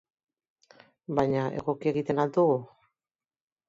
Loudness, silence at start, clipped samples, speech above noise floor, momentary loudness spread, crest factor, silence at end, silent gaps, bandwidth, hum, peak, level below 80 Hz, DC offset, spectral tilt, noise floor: -28 LUFS; 1.1 s; under 0.1%; over 63 dB; 7 LU; 20 dB; 1.05 s; none; 7.6 kHz; none; -10 dBFS; -64 dBFS; under 0.1%; -8.5 dB/octave; under -90 dBFS